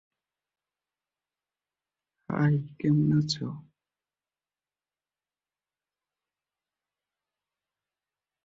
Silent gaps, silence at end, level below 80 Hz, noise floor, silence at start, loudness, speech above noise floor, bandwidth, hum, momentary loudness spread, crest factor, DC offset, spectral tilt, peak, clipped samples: none; 4.85 s; -68 dBFS; under -90 dBFS; 2.3 s; -27 LUFS; over 64 dB; 7.8 kHz; none; 13 LU; 20 dB; under 0.1%; -7 dB/octave; -14 dBFS; under 0.1%